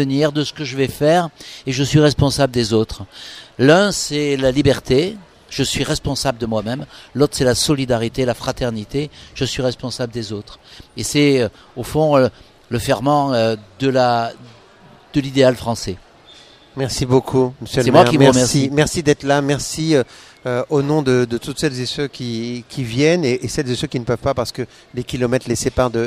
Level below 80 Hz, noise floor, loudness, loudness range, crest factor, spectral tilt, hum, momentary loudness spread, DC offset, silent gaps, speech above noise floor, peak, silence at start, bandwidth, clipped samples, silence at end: -40 dBFS; -46 dBFS; -18 LUFS; 5 LU; 18 dB; -5 dB/octave; none; 13 LU; under 0.1%; none; 28 dB; 0 dBFS; 0 s; 15.5 kHz; under 0.1%; 0 s